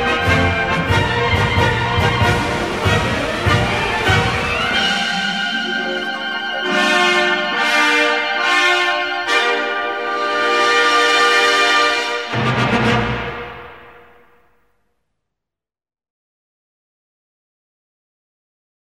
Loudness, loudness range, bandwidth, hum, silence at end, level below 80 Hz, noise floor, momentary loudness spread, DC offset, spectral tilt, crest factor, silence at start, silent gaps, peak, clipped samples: -15 LUFS; 6 LU; 16 kHz; none; 4.9 s; -36 dBFS; -87 dBFS; 8 LU; 0.3%; -4 dB/octave; 16 dB; 0 s; none; -2 dBFS; under 0.1%